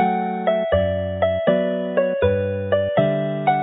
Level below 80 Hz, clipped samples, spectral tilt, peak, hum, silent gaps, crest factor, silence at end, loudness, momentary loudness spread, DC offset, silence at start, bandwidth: -40 dBFS; under 0.1%; -12 dB/octave; -4 dBFS; none; none; 16 dB; 0 s; -20 LUFS; 3 LU; under 0.1%; 0 s; 4 kHz